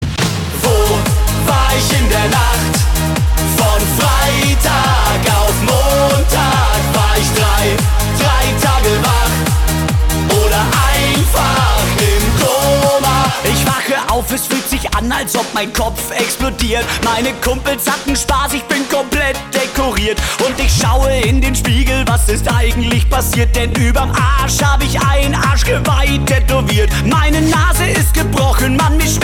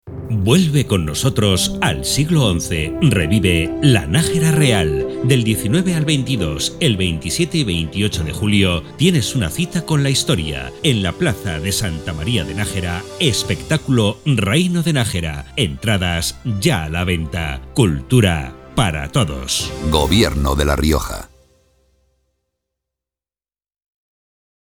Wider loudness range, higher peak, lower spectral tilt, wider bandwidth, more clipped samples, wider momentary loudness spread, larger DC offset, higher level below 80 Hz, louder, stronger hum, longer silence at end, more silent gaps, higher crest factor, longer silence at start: about the same, 3 LU vs 4 LU; second, -4 dBFS vs 0 dBFS; about the same, -4 dB/octave vs -5 dB/octave; about the same, 18 kHz vs 18.5 kHz; neither; about the same, 4 LU vs 6 LU; second, under 0.1% vs 0.2%; first, -18 dBFS vs -32 dBFS; first, -13 LUFS vs -17 LUFS; neither; second, 0 s vs 3.4 s; neither; second, 10 dB vs 18 dB; about the same, 0 s vs 0.05 s